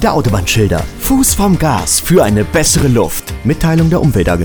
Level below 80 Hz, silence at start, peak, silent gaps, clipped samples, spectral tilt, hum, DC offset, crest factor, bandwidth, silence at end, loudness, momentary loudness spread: -24 dBFS; 0 s; 0 dBFS; none; under 0.1%; -5 dB/octave; none; under 0.1%; 10 dB; over 20 kHz; 0 s; -12 LUFS; 5 LU